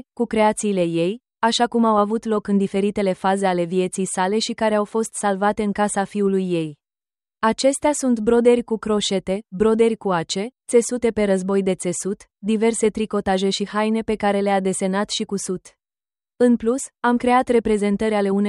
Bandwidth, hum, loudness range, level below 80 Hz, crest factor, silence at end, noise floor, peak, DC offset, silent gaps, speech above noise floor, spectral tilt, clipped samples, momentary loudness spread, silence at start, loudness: 12 kHz; none; 2 LU; -52 dBFS; 16 dB; 0 s; under -90 dBFS; -4 dBFS; under 0.1%; none; over 70 dB; -5 dB/octave; under 0.1%; 6 LU; 0.2 s; -20 LUFS